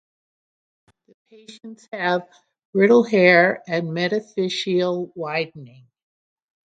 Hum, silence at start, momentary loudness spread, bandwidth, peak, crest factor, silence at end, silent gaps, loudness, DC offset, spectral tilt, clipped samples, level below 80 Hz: none; 1.5 s; 18 LU; 9 kHz; -2 dBFS; 20 dB; 1 s; 2.65-2.73 s; -19 LUFS; under 0.1%; -6 dB/octave; under 0.1%; -70 dBFS